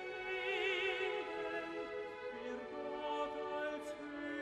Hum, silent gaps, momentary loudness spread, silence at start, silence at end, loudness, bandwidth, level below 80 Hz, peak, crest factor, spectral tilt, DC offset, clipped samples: none; none; 9 LU; 0 s; 0 s; -41 LUFS; 12.5 kHz; -74 dBFS; -24 dBFS; 16 dB; -3.5 dB/octave; under 0.1%; under 0.1%